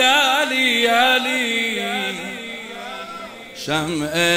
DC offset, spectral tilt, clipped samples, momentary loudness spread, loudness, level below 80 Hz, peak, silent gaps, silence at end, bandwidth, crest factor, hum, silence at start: under 0.1%; -2.5 dB/octave; under 0.1%; 16 LU; -18 LUFS; -56 dBFS; -4 dBFS; none; 0 s; 16 kHz; 16 dB; none; 0 s